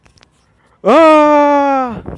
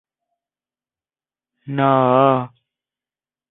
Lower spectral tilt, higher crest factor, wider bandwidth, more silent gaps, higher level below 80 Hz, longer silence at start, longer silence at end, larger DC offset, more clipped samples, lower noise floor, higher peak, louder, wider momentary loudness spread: second, -6 dB/octave vs -12 dB/octave; second, 12 dB vs 20 dB; first, 10.5 kHz vs 4 kHz; neither; first, -46 dBFS vs -64 dBFS; second, 0.85 s vs 1.65 s; second, 0 s vs 1.05 s; neither; neither; second, -53 dBFS vs under -90 dBFS; about the same, 0 dBFS vs -2 dBFS; first, -9 LUFS vs -16 LUFS; second, 10 LU vs 14 LU